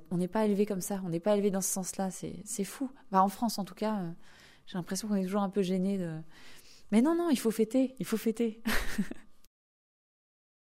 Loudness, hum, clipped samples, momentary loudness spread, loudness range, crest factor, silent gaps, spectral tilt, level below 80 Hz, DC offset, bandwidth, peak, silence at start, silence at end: -32 LUFS; none; under 0.1%; 12 LU; 3 LU; 20 dB; none; -5 dB/octave; -52 dBFS; under 0.1%; 16 kHz; -12 dBFS; 0 s; 1.2 s